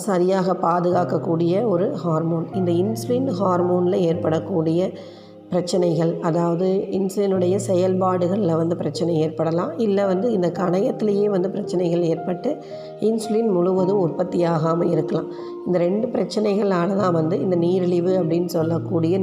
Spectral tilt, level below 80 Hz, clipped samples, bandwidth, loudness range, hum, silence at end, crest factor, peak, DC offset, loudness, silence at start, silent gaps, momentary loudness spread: -7.5 dB/octave; -66 dBFS; under 0.1%; 15 kHz; 1 LU; none; 0 s; 14 dB; -6 dBFS; under 0.1%; -21 LUFS; 0 s; none; 4 LU